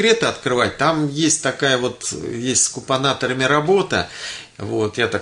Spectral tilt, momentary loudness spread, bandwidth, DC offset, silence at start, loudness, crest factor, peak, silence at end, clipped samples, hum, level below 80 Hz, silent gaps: -3 dB/octave; 9 LU; 11 kHz; under 0.1%; 0 s; -19 LUFS; 16 dB; -2 dBFS; 0 s; under 0.1%; none; -54 dBFS; none